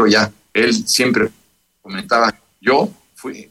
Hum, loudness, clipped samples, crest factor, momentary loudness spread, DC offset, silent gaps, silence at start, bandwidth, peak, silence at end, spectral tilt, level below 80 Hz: none; -16 LUFS; under 0.1%; 16 dB; 16 LU; under 0.1%; none; 0 s; 15 kHz; -2 dBFS; 0.05 s; -3 dB/octave; -56 dBFS